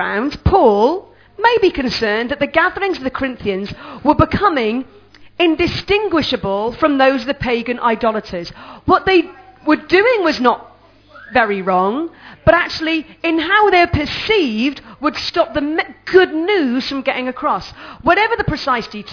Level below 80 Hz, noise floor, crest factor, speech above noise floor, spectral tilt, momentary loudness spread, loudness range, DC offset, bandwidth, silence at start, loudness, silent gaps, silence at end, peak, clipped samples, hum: -38 dBFS; -44 dBFS; 16 dB; 28 dB; -6 dB/octave; 9 LU; 2 LU; under 0.1%; 5.4 kHz; 0 s; -16 LUFS; none; 0 s; 0 dBFS; under 0.1%; none